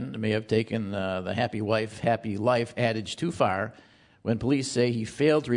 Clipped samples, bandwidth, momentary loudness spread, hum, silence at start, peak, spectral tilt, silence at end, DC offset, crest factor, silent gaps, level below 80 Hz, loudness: under 0.1%; 11 kHz; 5 LU; none; 0 s; -8 dBFS; -6 dB/octave; 0 s; under 0.1%; 18 dB; none; -60 dBFS; -27 LUFS